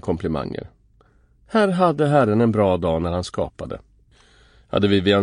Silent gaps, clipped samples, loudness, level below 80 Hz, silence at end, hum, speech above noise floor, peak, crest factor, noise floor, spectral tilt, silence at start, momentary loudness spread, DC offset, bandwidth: none; under 0.1%; -20 LUFS; -44 dBFS; 0 s; none; 37 dB; -2 dBFS; 18 dB; -56 dBFS; -7 dB/octave; 0.05 s; 15 LU; under 0.1%; 10.5 kHz